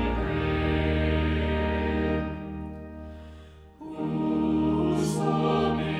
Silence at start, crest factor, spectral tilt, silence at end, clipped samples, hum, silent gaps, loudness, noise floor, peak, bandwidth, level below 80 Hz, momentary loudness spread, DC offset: 0 s; 16 dB; -7 dB/octave; 0 s; under 0.1%; none; none; -27 LUFS; -47 dBFS; -12 dBFS; 12.5 kHz; -36 dBFS; 17 LU; under 0.1%